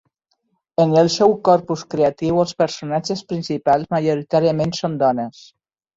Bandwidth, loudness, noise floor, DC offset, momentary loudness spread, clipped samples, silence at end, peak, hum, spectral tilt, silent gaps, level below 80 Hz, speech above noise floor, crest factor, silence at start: 7.8 kHz; -19 LUFS; -70 dBFS; under 0.1%; 10 LU; under 0.1%; 0.65 s; -2 dBFS; none; -6 dB/octave; none; -56 dBFS; 52 dB; 18 dB; 0.8 s